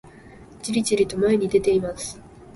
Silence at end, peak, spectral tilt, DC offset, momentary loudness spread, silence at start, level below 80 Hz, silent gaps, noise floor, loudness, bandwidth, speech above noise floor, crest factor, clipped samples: 0 s; -6 dBFS; -5 dB/octave; under 0.1%; 14 LU; 0.05 s; -50 dBFS; none; -45 dBFS; -22 LUFS; 11.5 kHz; 24 dB; 16 dB; under 0.1%